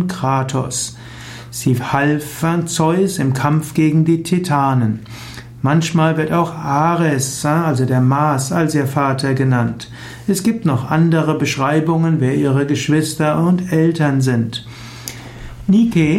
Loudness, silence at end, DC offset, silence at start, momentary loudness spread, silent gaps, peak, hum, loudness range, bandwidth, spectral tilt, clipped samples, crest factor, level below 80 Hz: -16 LUFS; 0 s; under 0.1%; 0 s; 14 LU; none; -2 dBFS; none; 2 LU; 16 kHz; -6 dB/octave; under 0.1%; 14 dB; -46 dBFS